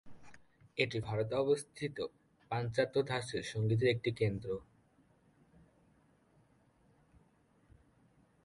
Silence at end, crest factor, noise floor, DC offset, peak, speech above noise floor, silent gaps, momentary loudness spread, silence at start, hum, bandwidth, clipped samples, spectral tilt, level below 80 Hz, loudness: 3.8 s; 22 dB; -70 dBFS; under 0.1%; -16 dBFS; 35 dB; none; 11 LU; 0.05 s; none; 11.5 kHz; under 0.1%; -6 dB/octave; -66 dBFS; -36 LUFS